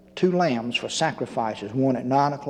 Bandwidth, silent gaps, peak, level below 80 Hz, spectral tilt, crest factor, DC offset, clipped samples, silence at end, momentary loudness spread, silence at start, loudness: 11 kHz; none; -8 dBFS; -64 dBFS; -5 dB/octave; 16 dB; under 0.1%; under 0.1%; 0 s; 6 LU; 0.15 s; -24 LUFS